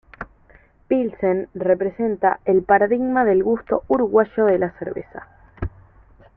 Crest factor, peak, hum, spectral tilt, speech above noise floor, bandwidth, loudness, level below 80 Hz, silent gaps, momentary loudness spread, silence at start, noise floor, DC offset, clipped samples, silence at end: 18 dB; -2 dBFS; none; -11.5 dB/octave; 33 dB; 3.5 kHz; -19 LUFS; -46 dBFS; none; 16 LU; 0.2 s; -52 dBFS; under 0.1%; under 0.1%; 0.7 s